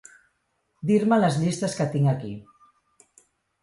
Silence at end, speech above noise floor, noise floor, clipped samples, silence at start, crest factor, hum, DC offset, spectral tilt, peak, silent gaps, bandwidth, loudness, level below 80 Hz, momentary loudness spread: 1.2 s; 50 dB; -73 dBFS; under 0.1%; 0.85 s; 18 dB; none; under 0.1%; -6.5 dB/octave; -8 dBFS; none; 11.5 kHz; -23 LUFS; -64 dBFS; 14 LU